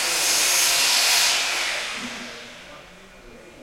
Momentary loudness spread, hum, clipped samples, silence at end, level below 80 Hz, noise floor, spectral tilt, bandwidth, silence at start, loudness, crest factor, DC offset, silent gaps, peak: 19 LU; none; under 0.1%; 0 s; -56 dBFS; -45 dBFS; 2 dB/octave; 16.5 kHz; 0 s; -18 LUFS; 18 dB; under 0.1%; none; -6 dBFS